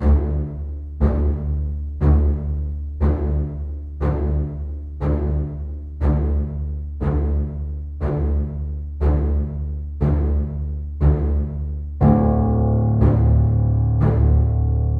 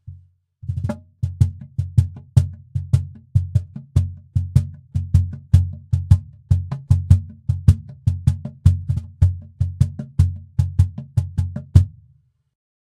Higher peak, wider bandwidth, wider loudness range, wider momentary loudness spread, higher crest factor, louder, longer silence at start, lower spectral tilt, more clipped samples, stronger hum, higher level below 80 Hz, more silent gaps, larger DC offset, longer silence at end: second, -4 dBFS vs 0 dBFS; second, 2.5 kHz vs 9.8 kHz; first, 6 LU vs 3 LU; about the same, 11 LU vs 9 LU; about the same, 16 dB vs 20 dB; about the same, -21 LUFS vs -21 LUFS; about the same, 0 s vs 0.05 s; first, -12 dB/octave vs -8.5 dB/octave; neither; neither; first, -22 dBFS vs -30 dBFS; neither; neither; second, 0 s vs 1.05 s